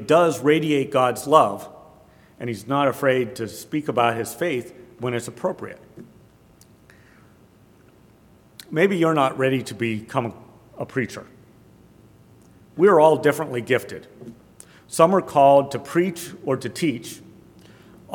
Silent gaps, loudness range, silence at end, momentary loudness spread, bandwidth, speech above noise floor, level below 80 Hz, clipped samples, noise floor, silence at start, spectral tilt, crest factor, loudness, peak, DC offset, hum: none; 10 LU; 0 s; 19 LU; 18 kHz; 32 dB; -64 dBFS; under 0.1%; -53 dBFS; 0 s; -5.5 dB/octave; 22 dB; -21 LUFS; 0 dBFS; under 0.1%; none